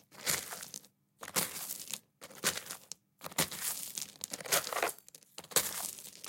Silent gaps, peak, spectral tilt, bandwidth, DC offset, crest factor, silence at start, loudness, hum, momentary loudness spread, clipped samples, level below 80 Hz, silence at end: none; -10 dBFS; -0.5 dB/octave; 17 kHz; under 0.1%; 30 dB; 0.1 s; -35 LUFS; none; 18 LU; under 0.1%; -76 dBFS; 0 s